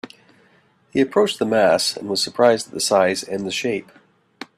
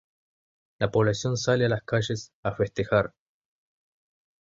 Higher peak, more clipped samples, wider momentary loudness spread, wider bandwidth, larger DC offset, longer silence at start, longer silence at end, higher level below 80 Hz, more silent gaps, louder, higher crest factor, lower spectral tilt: first, -2 dBFS vs -8 dBFS; neither; about the same, 9 LU vs 8 LU; first, 14 kHz vs 7.6 kHz; neither; second, 0.05 s vs 0.8 s; second, 0.75 s vs 1.35 s; second, -64 dBFS vs -54 dBFS; second, none vs 2.33-2.43 s; first, -19 LUFS vs -26 LUFS; about the same, 18 dB vs 20 dB; second, -3.5 dB/octave vs -5.5 dB/octave